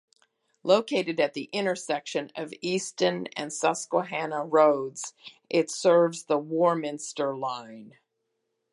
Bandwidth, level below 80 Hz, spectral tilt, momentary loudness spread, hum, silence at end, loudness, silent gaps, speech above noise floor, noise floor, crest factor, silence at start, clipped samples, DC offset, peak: 11.5 kHz; -82 dBFS; -4 dB/octave; 12 LU; none; 0.85 s; -27 LUFS; none; 53 dB; -79 dBFS; 20 dB; 0.65 s; under 0.1%; under 0.1%; -6 dBFS